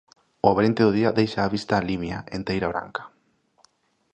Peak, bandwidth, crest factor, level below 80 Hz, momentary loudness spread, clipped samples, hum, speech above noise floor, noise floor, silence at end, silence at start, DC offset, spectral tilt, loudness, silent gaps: -2 dBFS; 9.2 kHz; 22 dB; -50 dBFS; 11 LU; under 0.1%; none; 43 dB; -65 dBFS; 1.05 s; 0.45 s; under 0.1%; -7 dB/octave; -23 LUFS; none